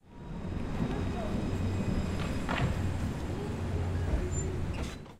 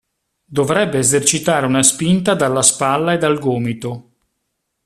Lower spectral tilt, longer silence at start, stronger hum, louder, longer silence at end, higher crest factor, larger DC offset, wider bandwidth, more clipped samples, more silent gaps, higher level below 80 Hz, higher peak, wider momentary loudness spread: first, -6.5 dB/octave vs -3.5 dB/octave; second, 0.05 s vs 0.5 s; neither; second, -34 LUFS vs -15 LUFS; second, 0 s vs 0.85 s; about the same, 16 dB vs 16 dB; neither; second, 13.5 kHz vs 15 kHz; neither; neither; first, -38 dBFS vs -52 dBFS; second, -16 dBFS vs 0 dBFS; second, 6 LU vs 11 LU